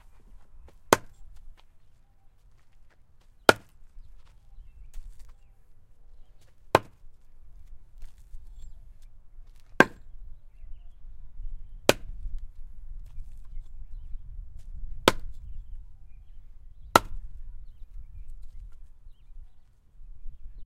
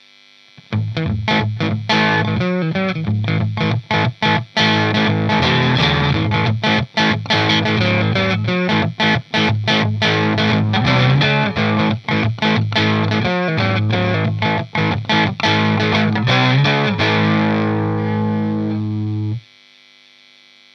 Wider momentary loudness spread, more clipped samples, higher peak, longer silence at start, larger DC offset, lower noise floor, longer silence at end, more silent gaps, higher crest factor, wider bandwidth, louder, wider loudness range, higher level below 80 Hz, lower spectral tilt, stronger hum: first, 29 LU vs 6 LU; neither; about the same, 0 dBFS vs -2 dBFS; second, 0.05 s vs 0.7 s; neither; first, -55 dBFS vs -48 dBFS; second, 0 s vs 1.35 s; neither; first, 32 dB vs 16 dB; first, 16 kHz vs 7 kHz; second, -25 LUFS vs -16 LUFS; about the same, 5 LU vs 3 LU; about the same, -42 dBFS vs -44 dBFS; second, -3.5 dB/octave vs -6.5 dB/octave; neither